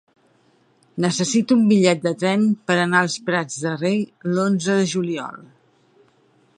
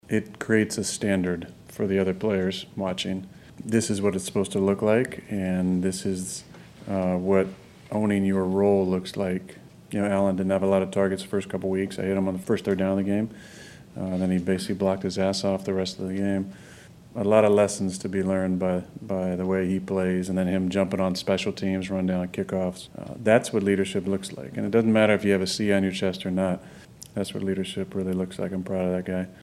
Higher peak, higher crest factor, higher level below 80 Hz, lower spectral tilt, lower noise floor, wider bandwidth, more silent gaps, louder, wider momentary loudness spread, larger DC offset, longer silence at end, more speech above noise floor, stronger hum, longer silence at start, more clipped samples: about the same, -2 dBFS vs -4 dBFS; about the same, 18 dB vs 22 dB; second, -68 dBFS vs -60 dBFS; about the same, -5 dB/octave vs -6 dB/octave; first, -59 dBFS vs -48 dBFS; second, 11 kHz vs 13.5 kHz; neither; first, -20 LUFS vs -26 LUFS; about the same, 9 LU vs 10 LU; neither; first, 1.15 s vs 0 s; first, 40 dB vs 23 dB; neither; first, 0.95 s vs 0.1 s; neither